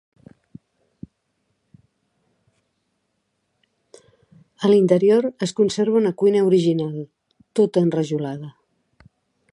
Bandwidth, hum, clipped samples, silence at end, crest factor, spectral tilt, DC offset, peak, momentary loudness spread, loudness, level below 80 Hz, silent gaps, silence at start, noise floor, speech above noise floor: 11 kHz; none; under 0.1%; 1 s; 20 dB; -7 dB/octave; under 0.1%; -4 dBFS; 15 LU; -19 LUFS; -66 dBFS; none; 4.6 s; -73 dBFS; 55 dB